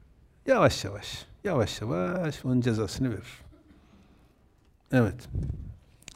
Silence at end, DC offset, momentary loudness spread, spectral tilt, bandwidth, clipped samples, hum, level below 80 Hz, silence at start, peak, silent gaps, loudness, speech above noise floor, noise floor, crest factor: 0.4 s; under 0.1%; 16 LU; -6 dB/octave; 16 kHz; under 0.1%; none; -48 dBFS; 0.45 s; -6 dBFS; none; -29 LUFS; 35 dB; -62 dBFS; 22 dB